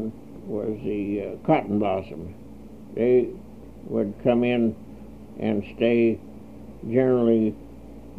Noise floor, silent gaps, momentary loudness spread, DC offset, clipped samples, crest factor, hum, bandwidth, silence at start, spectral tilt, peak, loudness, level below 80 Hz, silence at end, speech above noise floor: -43 dBFS; none; 23 LU; 0.4%; under 0.1%; 18 dB; none; 4.9 kHz; 0 s; -9 dB/octave; -6 dBFS; -24 LUFS; -52 dBFS; 0 s; 20 dB